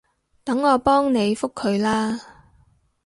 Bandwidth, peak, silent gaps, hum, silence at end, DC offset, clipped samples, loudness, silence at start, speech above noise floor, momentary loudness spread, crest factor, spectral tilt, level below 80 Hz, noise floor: 11.5 kHz; -4 dBFS; none; none; 0.8 s; under 0.1%; under 0.1%; -21 LUFS; 0.45 s; 39 dB; 10 LU; 18 dB; -5.5 dB/octave; -52 dBFS; -59 dBFS